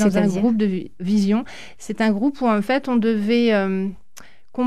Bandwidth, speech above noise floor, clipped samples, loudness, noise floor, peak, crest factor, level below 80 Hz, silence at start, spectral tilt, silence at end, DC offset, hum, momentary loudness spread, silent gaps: 12.5 kHz; 29 dB; under 0.1%; -20 LUFS; -48 dBFS; -6 dBFS; 14 dB; -52 dBFS; 0 s; -6.5 dB/octave; 0 s; 1%; none; 12 LU; none